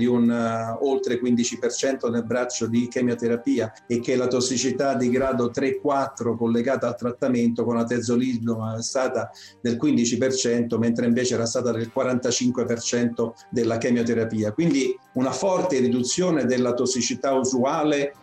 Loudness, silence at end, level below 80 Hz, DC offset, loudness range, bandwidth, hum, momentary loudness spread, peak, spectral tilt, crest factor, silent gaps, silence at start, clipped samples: -23 LUFS; 0.1 s; -60 dBFS; under 0.1%; 1 LU; 10 kHz; none; 4 LU; -12 dBFS; -4.5 dB/octave; 10 dB; none; 0 s; under 0.1%